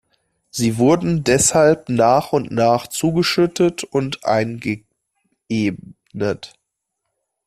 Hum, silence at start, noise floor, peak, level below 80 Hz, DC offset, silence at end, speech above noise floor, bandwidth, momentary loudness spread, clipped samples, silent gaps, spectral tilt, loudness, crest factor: none; 0.55 s; -77 dBFS; -2 dBFS; -50 dBFS; under 0.1%; 1 s; 59 dB; 14.5 kHz; 11 LU; under 0.1%; none; -4.5 dB/octave; -18 LUFS; 18 dB